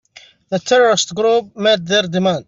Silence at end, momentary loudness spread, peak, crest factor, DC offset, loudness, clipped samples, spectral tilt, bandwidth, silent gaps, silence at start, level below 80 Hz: 0.05 s; 6 LU; -2 dBFS; 14 dB; under 0.1%; -15 LUFS; under 0.1%; -3.5 dB/octave; 7.8 kHz; none; 0.5 s; -60 dBFS